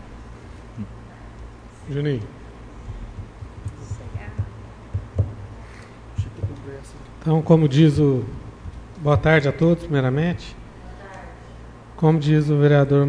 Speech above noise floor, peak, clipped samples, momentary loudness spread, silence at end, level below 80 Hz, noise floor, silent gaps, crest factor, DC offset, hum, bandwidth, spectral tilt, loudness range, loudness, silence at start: 23 dB; -4 dBFS; under 0.1%; 25 LU; 0 s; -40 dBFS; -40 dBFS; none; 18 dB; under 0.1%; none; 9.8 kHz; -8.5 dB/octave; 13 LU; -20 LUFS; 0 s